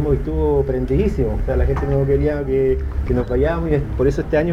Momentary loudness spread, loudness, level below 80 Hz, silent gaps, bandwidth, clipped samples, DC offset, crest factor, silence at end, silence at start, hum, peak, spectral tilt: 3 LU; -19 LUFS; -24 dBFS; none; 7.4 kHz; under 0.1%; 0.2%; 12 dB; 0 s; 0 s; none; -6 dBFS; -9.5 dB/octave